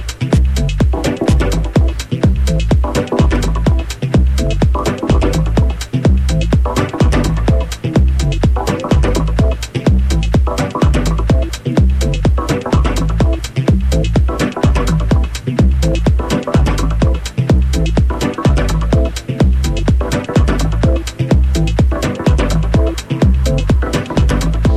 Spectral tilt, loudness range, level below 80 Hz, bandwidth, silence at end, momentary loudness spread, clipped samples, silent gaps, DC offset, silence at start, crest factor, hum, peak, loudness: -6.5 dB/octave; 0 LU; -16 dBFS; 13.5 kHz; 0 s; 3 LU; under 0.1%; none; under 0.1%; 0 s; 12 dB; none; 0 dBFS; -15 LUFS